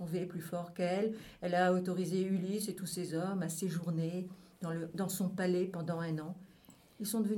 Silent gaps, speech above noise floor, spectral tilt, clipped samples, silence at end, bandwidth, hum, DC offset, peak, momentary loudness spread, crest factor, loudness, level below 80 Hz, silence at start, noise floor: none; 26 dB; -6 dB/octave; under 0.1%; 0 s; 18.5 kHz; none; under 0.1%; -18 dBFS; 9 LU; 18 dB; -36 LUFS; -74 dBFS; 0 s; -61 dBFS